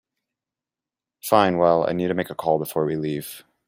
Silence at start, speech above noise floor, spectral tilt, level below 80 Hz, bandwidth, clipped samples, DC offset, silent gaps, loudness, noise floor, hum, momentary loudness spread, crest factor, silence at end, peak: 1.25 s; 68 dB; -6 dB/octave; -62 dBFS; 16 kHz; under 0.1%; under 0.1%; none; -22 LUFS; -89 dBFS; none; 12 LU; 22 dB; 0.25 s; -2 dBFS